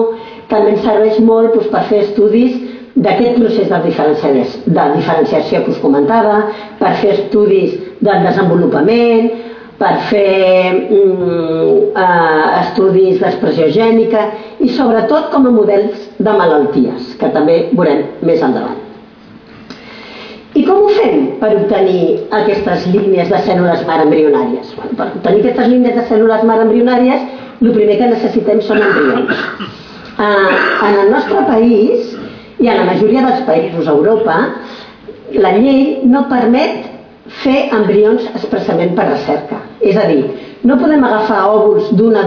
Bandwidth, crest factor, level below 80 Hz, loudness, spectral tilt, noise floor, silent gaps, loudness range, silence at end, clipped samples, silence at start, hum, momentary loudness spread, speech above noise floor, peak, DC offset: 5.4 kHz; 10 dB; -48 dBFS; -11 LUFS; -8 dB/octave; -37 dBFS; none; 2 LU; 0 s; under 0.1%; 0 s; none; 8 LU; 26 dB; 0 dBFS; under 0.1%